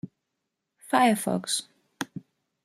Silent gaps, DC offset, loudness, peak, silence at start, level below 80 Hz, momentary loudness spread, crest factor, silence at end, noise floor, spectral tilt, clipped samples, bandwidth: none; under 0.1%; -26 LUFS; -6 dBFS; 0.05 s; -74 dBFS; 20 LU; 22 dB; 0.45 s; -82 dBFS; -3.5 dB/octave; under 0.1%; 16 kHz